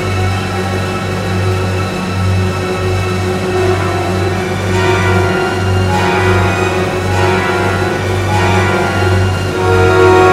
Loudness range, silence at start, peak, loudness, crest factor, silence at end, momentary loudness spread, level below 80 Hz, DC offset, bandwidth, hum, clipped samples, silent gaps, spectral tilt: 3 LU; 0 s; 0 dBFS; -13 LUFS; 12 dB; 0 s; 5 LU; -34 dBFS; under 0.1%; 14 kHz; none; 0.2%; none; -6 dB/octave